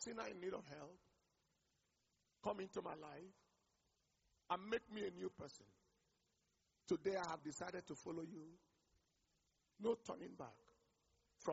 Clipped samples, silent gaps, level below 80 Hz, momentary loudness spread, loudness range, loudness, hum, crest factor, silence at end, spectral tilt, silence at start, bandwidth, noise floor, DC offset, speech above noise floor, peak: under 0.1%; none; -82 dBFS; 15 LU; 6 LU; -49 LUFS; none; 24 dB; 0 s; -4 dB/octave; 0 s; 7.6 kHz; -85 dBFS; under 0.1%; 37 dB; -28 dBFS